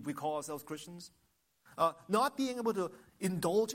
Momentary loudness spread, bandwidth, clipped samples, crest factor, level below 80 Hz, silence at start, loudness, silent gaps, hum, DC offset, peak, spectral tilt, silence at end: 18 LU; 16.5 kHz; under 0.1%; 18 dB; -74 dBFS; 0 s; -35 LUFS; none; none; under 0.1%; -16 dBFS; -5 dB/octave; 0 s